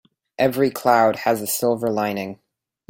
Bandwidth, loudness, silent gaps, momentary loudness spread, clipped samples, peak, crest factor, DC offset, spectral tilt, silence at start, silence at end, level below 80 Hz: 17 kHz; -20 LUFS; none; 8 LU; under 0.1%; -2 dBFS; 18 dB; under 0.1%; -4.5 dB/octave; 0.4 s; 0.55 s; -62 dBFS